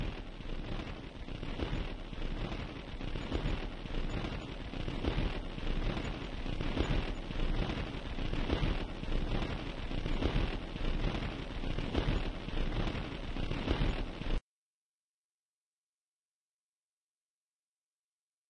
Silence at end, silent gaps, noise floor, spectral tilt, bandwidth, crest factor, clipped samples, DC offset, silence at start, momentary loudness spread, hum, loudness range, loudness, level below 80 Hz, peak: 4.1 s; none; under -90 dBFS; -6.5 dB/octave; 9.2 kHz; 22 dB; under 0.1%; under 0.1%; 0 s; 8 LU; none; 4 LU; -39 LUFS; -38 dBFS; -14 dBFS